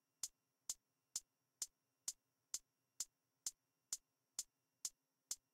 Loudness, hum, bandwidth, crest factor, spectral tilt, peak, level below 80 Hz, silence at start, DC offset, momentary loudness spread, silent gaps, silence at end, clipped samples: -51 LUFS; none; 16 kHz; 26 dB; 2.5 dB/octave; -30 dBFS; -86 dBFS; 0.25 s; under 0.1%; 1 LU; none; 0.2 s; under 0.1%